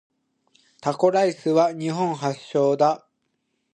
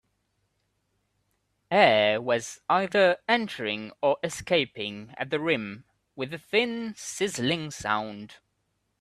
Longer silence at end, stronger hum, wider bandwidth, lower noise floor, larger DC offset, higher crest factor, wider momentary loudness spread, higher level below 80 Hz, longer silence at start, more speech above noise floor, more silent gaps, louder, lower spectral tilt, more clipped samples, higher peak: about the same, 0.75 s vs 0.65 s; neither; second, 10 kHz vs 13.5 kHz; about the same, -74 dBFS vs -76 dBFS; neither; second, 18 dB vs 24 dB; second, 9 LU vs 14 LU; second, -72 dBFS vs -66 dBFS; second, 0.85 s vs 1.7 s; first, 53 dB vs 49 dB; neither; first, -22 LUFS vs -26 LUFS; first, -6 dB/octave vs -4 dB/octave; neither; about the same, -6 dBFS vs -4 dBFS